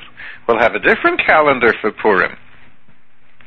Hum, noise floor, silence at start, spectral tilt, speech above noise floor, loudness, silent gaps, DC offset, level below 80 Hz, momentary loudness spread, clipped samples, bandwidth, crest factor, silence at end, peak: none; -54 dBFS; 0.2 s; -6.5 dB/octave; 40 dB; -14 LUFS; none; under 0.1%; -46 dBFS; 9 LU; under 0.1%; 6.4 kHz; 16 dB; 0 s; 0 dBFS